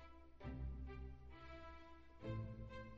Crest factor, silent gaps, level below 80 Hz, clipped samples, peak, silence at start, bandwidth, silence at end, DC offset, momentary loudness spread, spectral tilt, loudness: 16 dB; none; -56 dBFS; under 0.1%; -36 dBFS; 0 s; 6.6 kHz; 0 s; under 0.1%; 11 LU; -7 dB/octave; -53 LUFS